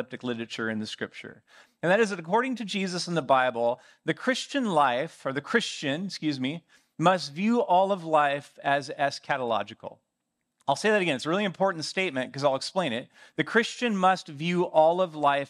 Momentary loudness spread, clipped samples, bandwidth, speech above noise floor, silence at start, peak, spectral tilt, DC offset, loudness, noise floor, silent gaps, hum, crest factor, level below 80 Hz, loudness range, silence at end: 10 LU; under 0.1%; 12.5 kHz; 54 dB; 0 s; -8 dBFS; -4.5 dB/octave; under 0.1%; -27 LUFS; -81 dBFS; none; none; 20 dB; -80 dBFS; 2 LU; 0.05 s